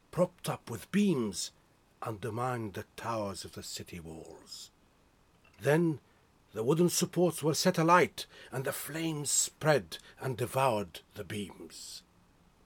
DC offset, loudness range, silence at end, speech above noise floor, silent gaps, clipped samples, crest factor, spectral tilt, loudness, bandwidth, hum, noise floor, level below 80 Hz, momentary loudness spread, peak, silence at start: under 0.1%; 10 LU; 0.65 s; 34 dB; none; under 0.1%; 22 dB; -4.5 dB/octave; -32 LUFS; 18.5 kHz; none; -66 dBFS; -66 dBFS; 18 LU; -10 dBFS; 0.15 s